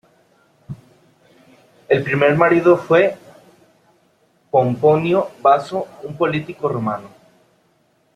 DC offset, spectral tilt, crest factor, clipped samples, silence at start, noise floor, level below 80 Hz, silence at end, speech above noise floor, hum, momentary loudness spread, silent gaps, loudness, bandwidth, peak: under 0.1%; -7.5 dB/octave; 18 dB; under 0.1%; 0.7 s; -60 dBFS; -60 dBFS; 1.1 s; 44 dB; none; 19 LU; none; -17 LUFS; 10.5 kHz; -2 dBFS